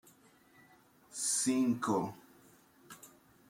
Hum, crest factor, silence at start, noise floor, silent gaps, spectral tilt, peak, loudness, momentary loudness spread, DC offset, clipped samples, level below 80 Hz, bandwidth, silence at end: none; 18 dB; 1.1 s; -64 dBFS; none; -3.5 dB/octave; -20 dBFS; -33 LUFS; 24 LU; under 0.1%; under 0.1%; -80 dBFS; 16.5 kHz; 0.45 s